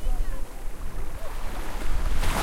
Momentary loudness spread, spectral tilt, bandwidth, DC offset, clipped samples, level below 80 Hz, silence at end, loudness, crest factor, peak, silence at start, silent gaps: 9 LU; -4.5 dB/octave; 15 kHz; under 0.1%; under 0.1%; -26 dBFS; 0 s; -35 LUFS; 12 dB; -10 dBFS; 0 s; none